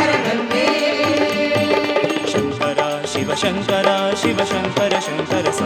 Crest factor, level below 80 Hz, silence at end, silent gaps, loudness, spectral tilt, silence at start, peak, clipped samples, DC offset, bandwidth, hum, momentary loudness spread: 16 dB; -54 dBFS; 0 s; none; -18 LUFS; -4 dB/octave; 0 s; -2 dBFS; under 0.1%; under 0.1%; 17.5 kHz; none; 4 LU